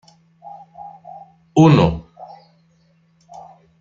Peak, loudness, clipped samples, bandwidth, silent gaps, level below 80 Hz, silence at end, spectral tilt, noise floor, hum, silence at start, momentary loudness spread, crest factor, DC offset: -2 dBFS; -14 LUFS; under 0.1%; 7.4 kHz; none; -44 dBFS; 1.8 s; -8 dB/octave; -58 dBFS; none; 0.45 s; 29 LU; 18 dB; under 0.1%